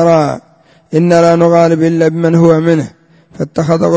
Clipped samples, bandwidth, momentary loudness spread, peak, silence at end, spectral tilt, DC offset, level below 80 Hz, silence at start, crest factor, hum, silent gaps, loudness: 0.3%; 8 kHz; 11 LU; 0 dBFS; 0 s; -7.5 dB/octave; under 0.1%; -48 dBFS; 0 s; 10 dB; none; none; -10 LUFS